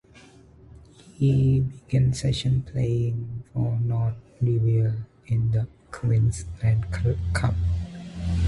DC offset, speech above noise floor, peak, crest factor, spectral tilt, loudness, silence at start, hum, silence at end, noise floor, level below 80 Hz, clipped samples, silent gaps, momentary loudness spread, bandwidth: under 0.1%; 28 dB; -10 dBFS; 14 dB; -7 dB/octave; -25 LUFS; 0.15 s; none; 0 s; -51 dBFS; -36 dBFS; under 0.1%; none; 9 LU; 11.5 kHz